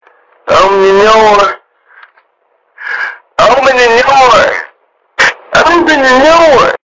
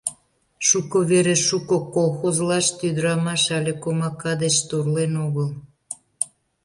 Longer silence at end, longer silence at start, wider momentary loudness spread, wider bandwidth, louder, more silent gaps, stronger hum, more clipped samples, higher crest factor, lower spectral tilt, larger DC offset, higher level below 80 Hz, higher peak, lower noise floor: second, 0.15 s vs 0.4 s; first, 0.45 s vs 0.05 s; first, 14 LU vs 10 LU; second, 7.6 kHz vs 11.5 kHz; first, -6 LUFS vs -21 LUFS; neither; neither; neither; second, 8 dB vs 20 dB; about the same, -3 dB/octave vs -4 dB/octave; neither; first, -38 dBFS vs -60 dBFS; about the same, 0 dBFS vs -2 dBFS; about the same, -55 dBFS vs -54 dBFS